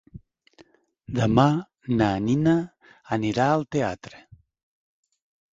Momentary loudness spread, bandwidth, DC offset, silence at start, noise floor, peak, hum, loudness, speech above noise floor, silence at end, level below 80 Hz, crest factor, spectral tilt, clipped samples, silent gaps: 12 LU; 7.8 kHz; under 0.1%; 0.15 s; -57 dBFS; -4 dBFS; none; -23 LUFS; 35 dB; 1.4 s; -52 dBFS; 22 dB; -7 dB/octave; under 0.1%; none